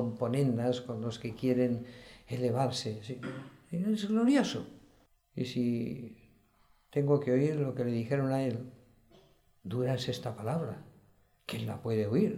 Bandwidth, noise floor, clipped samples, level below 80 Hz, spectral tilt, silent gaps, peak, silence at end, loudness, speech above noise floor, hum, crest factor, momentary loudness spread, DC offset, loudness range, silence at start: 15.5 kHz; -67 dBFS; under 0.1%; -68 dBFS; -7 dB/octave; none; -14 dBFS; 0 s; -33 LUFS; 35 dB; none; 18 dB; 15 LU; under 0.1%; 4 LU; 0 s